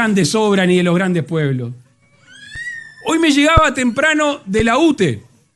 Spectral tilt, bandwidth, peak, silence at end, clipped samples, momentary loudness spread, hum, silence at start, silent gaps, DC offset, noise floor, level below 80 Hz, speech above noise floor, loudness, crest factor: -5 dB/octave; 12.5 kHz; 0 dBFS; 0.35 s; under 0.1%; 15 LU; none; 0 s; none; under 0.1%; -49 dBFS; -32 dBFS; 35 dB; -15 LUFS; 16 dB